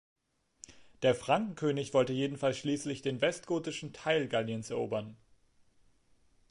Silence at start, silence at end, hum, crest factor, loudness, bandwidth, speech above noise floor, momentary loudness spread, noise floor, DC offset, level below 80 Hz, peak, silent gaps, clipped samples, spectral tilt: 0.7 s; 1.35 s; none; 20 dB; -33 LUFS; 11.5 kHz; 35 dB; 9 LU; -67 dBFS; under 0.1%; -70 dBFS; -14 dBFS; none; under 0.1%; -5 dB/octave